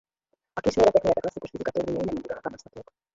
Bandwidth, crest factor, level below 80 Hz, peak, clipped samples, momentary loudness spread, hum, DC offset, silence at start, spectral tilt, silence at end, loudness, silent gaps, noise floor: 7.8 kHz; 20 dB; -52 dBFS; -6 dBFS; under 0.1%; 17 LU; none; under 0.1%; 0.55 s; -6 dB/octave; 0.35 s; -26 LUFS; none; -77 dBFS